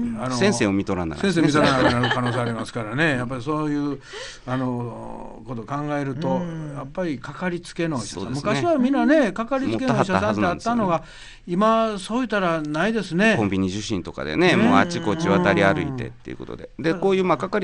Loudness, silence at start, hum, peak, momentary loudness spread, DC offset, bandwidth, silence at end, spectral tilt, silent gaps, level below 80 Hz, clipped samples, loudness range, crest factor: -22 LUFS; 0 s; none; -2 dBFS; 14 LU; under 0.1%; 10 kHz; 0 s; -6 dB/octave; none; -46 dBFS; under 0.1%; 7 LU; 20 dB